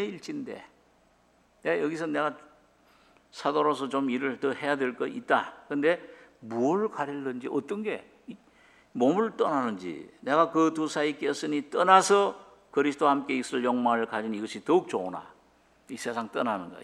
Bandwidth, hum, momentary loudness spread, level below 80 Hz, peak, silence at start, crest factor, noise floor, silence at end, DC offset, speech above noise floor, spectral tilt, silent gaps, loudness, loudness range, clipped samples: 13 kHz; none; 13 LU; -74 dBFS; -4 dBFS; 0 s; 24 dB; -64 dBFS; 0 s; under 0.1%; 37 dB; -4.5 dB/octave; none; -28 LUFS; 6 LU; under 0.1%